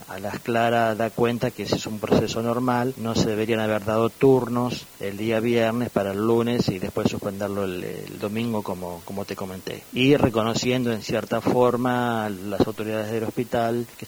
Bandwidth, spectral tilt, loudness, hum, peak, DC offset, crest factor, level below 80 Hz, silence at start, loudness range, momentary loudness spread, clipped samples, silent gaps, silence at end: over 20 kHz; -6 dB/octave; -24 LUFS; none; -6 dBFS; under 0.1%; 18 dB; -52 dBFS; 0 s; 3 LU; 12 LU; under 0.1%; none; 0 s